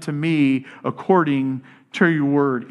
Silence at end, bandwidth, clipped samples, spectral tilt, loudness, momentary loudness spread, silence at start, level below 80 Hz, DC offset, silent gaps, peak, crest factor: 0.05 s; 11.5 kHz; under 0.1%; -7.5 dB/octave; -20 LUFS; 11 LU; 0 s; -72 dBFS; under 0.1%; none; -2 dBFS; 18 dB